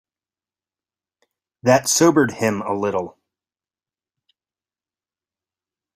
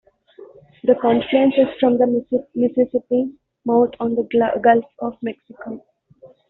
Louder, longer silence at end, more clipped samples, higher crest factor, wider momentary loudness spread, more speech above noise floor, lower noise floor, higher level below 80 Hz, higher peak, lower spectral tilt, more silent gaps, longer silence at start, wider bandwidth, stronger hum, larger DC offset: about the same, -18 LUFS vs -18 LUFS; first, 2.85 s vs 0.25 s; neither; first, 22 dB vs 16 dB; second, 10 LU vs 14 LU; first, over 72 dB vs 31 dB; first, under -90 dBFS vs -49 dBFS; about the same, -64 dBFS vs -60 dBFS; about the same, -2 dBFS vs -2 dBFS; about the same, -4 dB/octave vs -4.5 dB/octave; neither; first, 1.65 s vs 0.4 s; first, 16 kHz vs 4.1 kHz; neither; neither